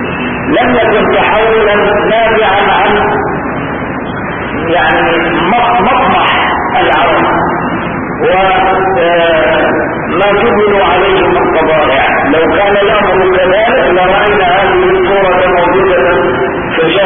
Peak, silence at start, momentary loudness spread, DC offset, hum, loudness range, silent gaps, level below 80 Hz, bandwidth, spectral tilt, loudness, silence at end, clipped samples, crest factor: 0 dBFS; 0 s; 6 LU; 0.3%; none; 3 LU; none; -32 dBFS; 3.7 kHz; -9 dB/octave; -9 LUFS; 0 s; under 0.1%; 8 dB